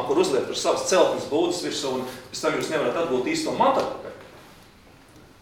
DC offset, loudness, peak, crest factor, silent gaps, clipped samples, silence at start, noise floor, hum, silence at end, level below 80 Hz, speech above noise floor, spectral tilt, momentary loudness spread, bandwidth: under 0.1%; -24 LUFS; -6 dBFS; 18 dB; none; under 0.1%; 0 s; -51 dBFS; none; 0.2 s; -58 dBFS; 27 dB; -3.5 dB/octave; 11 LU; 18 kHz